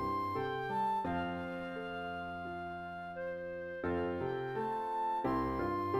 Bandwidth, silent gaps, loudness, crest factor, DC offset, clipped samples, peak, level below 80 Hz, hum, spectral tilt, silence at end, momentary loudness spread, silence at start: 16 kHz; none; -38 LUFS; 16 dB; under 0.1%; under 0.1%; -22 dBFS; -60 dBFS; none; -7.5 dB/octave; 0 s; 8 LU; 0 s